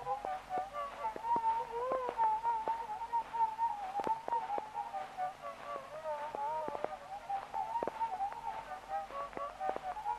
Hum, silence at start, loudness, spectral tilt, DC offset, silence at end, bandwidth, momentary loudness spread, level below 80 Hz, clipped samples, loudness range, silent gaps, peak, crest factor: none; 0 s; -38 LUFS; -4 dB/octave; under 0.1%; 0 s; 13.5 kHz; 9 LU; -68 dBFS; under 0.1%; 5 LU; none; -18 dBFS; 20 dB